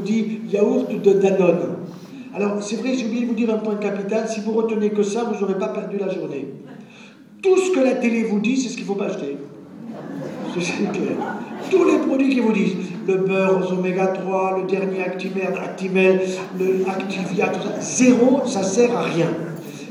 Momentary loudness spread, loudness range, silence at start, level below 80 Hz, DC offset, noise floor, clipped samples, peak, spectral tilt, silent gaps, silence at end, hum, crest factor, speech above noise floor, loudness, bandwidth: 14 LU; 4 LU; 0 s; -76 dBFS; under 0.1%; -44 dBFS; under 0.1%; -2 dBFS; -5.5 dB/octave; none; 0 s; none; 18 dB; 24 dB; -20 LUFS; 11 kHz